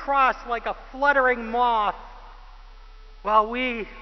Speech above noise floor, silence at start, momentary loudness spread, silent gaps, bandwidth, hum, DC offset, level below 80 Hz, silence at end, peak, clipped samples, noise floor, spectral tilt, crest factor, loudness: 21 dB; 0 s; 10 LU; none; 6.2 kHz; none; under 0.1%; -44 dBFS; 0 s; -6 dBFS; under 0.1%; -44 dBFS; -5 dB/octave; 18 dB; -23 LUFS